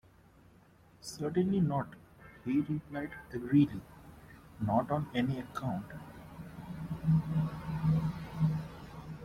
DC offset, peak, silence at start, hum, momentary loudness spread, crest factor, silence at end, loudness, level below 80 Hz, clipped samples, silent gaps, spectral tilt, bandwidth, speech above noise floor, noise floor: under 0.1%; -16 dBFS; 1.05 s; none; 18 LU; 18 dB; 0 s; -33 LUFS; -56 dBFS; under 0.1%; none; -8 dB/octave; 14 kHz; 29 dB; -61 dBFS